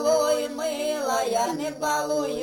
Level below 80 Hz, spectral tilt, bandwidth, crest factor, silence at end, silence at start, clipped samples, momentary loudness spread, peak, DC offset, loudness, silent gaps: -62 dBFS; -2.5 dB/octave; 17 kHz; 14 dB; 0 s; 0 s; under 0.1%; 5 LU; -12 dBFS; under 0.1%; -25 LUFS; none